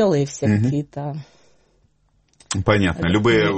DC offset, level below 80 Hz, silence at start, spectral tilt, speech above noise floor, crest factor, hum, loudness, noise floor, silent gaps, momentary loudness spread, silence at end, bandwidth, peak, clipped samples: under 0.1%; -44 dBFS; 0 s; -6 dB/octave; 43 dB; 20 dB; none; -20 LUFS; -62 dBFS; none; 13 LU; 0 s; 8.8 kHz; 0 dBFS; under 0.1%